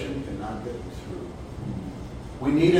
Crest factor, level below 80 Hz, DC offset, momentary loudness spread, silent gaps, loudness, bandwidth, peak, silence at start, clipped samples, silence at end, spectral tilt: 18 dB; -42 dBFS; under 0.1%; 11 LU; none; -32 LUFS; 10.5 kHz; -8 dBFS; 0 s; under 0.1%; 0 s; -7 dB/octave